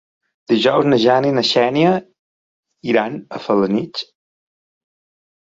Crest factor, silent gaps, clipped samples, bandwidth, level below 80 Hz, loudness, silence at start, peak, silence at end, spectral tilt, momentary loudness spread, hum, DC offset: 18 dB; 2.19-2.63 s; under 0.1%; 7.8 kHz; -62 dBFS; -16 LUFS; 0.5 s; 0 dBFS; 1.55 s; -6 dB/octave; 14 LU; none; under 0.1%